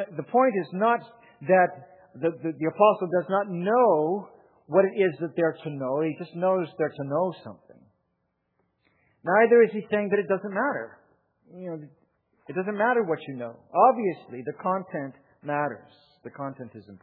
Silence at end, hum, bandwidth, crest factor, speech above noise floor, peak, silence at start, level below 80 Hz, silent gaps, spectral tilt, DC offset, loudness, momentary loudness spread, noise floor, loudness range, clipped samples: 0.05 s; none; 4.4 kHz; 20 dB; 51 dB; -6 dBFS; 0 s; -82 dBFS; none; -10.5 dB/octave; under 0.1%; -25 LUFS; 17 LU; -76 dBFS; 6 LU; under 0.1%